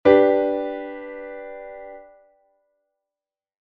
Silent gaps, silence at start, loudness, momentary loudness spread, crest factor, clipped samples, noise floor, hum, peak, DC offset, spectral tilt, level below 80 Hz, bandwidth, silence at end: none; 0.05 s; -21 LUFS; 24 LU; 22 dB; under 0.1%; under -90 dBFS; none; -2 dBFS; under 0.1%; -4 dB/octave; -58 dBFS; 4.9 kHz; 1.7 s